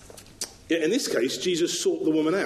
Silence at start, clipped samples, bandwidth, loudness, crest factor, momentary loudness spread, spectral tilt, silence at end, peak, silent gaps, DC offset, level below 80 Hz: 0 s; under 0.1%; 13 kHz; -25 LUFS; 14 dB; 12 LU; -3 dB/octave; 0 s; -12 dBFS; none; under 0.1%; -60 dBFS